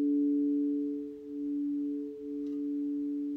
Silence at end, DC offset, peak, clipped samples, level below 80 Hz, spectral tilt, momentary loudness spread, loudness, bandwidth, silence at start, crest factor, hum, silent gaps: 0 s; under 0.1%; -24 dBFS; under 0.1%; -74 dBFS; -9 dB/octave; 10 LU; -33 LUFS; 1.3 kHz; 0 s; 10 dB; none; none